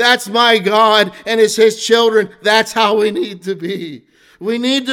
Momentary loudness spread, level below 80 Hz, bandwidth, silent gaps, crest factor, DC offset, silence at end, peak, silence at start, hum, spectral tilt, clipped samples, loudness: 12 LU; -62 dBFS; 16.5 kHz; none; 14 dB; under 0.1%; 0 s; 0 dBFS; 0 s; none; -3 dB/octave; under 0.1%; -13 LUFS